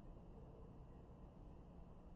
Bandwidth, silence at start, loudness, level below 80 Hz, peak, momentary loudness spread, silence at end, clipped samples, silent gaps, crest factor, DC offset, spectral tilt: 6.4 kHz; 0 s; -61 LUFS; -62 dBFS; -48 dBFS; 1 LU; 0 s; under 0.1%; none; 10 dB; under 0.1%; -9 dB/octave